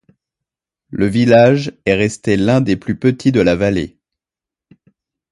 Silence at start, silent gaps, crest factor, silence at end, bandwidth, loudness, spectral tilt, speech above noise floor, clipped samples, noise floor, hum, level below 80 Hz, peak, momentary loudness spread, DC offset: 0.9 s; none; 16 dB; 1.45 s; 11.5 kHz; -14 LUFS; -7 dB/octave; 75 dB; under 0.1%; -88 dBFS; none; -42 dBFS; 0 dBFS; 9 LU; under 0.1%